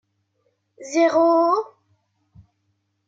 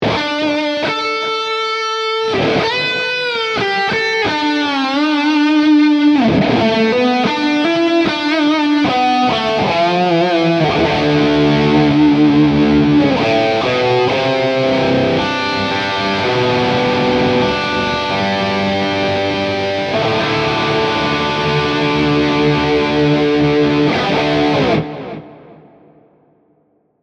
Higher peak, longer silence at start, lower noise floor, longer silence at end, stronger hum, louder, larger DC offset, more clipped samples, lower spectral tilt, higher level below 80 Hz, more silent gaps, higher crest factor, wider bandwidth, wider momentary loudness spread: second, -8 dBFS vs -2 dBFS; first, 0.8 s vs 0 s; first, -71 dBFS vs -58 dBFS; about the same, 1.4 s vs 1.5 s; neither; second, -19 LUFS vs -14 LUFS; neither; neither; second, -4 dB/octave vs -6 dB/octave; second, -70 dBFS vs -42 dBFS; neither; about the same, 16 dB vs 12 dB; about the same, 7.8 kHz vs 8.2 kHz; first, 20 LU vs 5 LU